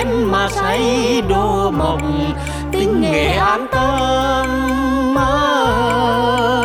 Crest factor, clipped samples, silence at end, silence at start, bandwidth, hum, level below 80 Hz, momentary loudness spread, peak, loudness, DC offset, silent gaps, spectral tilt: 12 dB; under 0.1%; 0 s; 0 s; 16 kHz; none; -28 dBFS; 4 LU; -2 dBFS; -16 LUFS; under 0.1%; none; -5.5 dB/octave